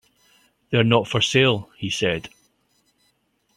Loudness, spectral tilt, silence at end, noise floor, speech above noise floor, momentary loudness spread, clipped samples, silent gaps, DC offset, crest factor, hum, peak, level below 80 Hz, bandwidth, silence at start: -21 LUFS; -4.5 dB/octave; 1.3 s; -67 dBFS; 47 dB; 11 LU; under 0.1%; none; under 0.1%; 22 dB; none; -2 dBFS; -56 dBFS; 12.5 kHz; 0.7 s